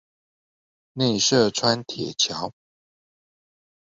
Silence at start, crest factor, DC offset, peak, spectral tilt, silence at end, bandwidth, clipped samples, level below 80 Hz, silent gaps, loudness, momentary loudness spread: 0.95 s; 20 dB; under 0.1%; -6 dBFS; -3.5 dB/octave; 1.45 s; 8 kHz; under 0.1%; -62 dBFS; none; -22 LUFS; 14 LU